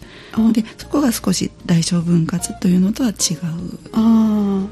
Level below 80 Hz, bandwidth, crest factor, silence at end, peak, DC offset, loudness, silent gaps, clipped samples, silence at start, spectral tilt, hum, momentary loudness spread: -44 dBFS; 14 kHz; 14 dB; 0 s; -2 dBFS; under 0.1%; -18 LUFS; none; under 0.1%; 0 s; -5.5 dB/octave; none; 8 LU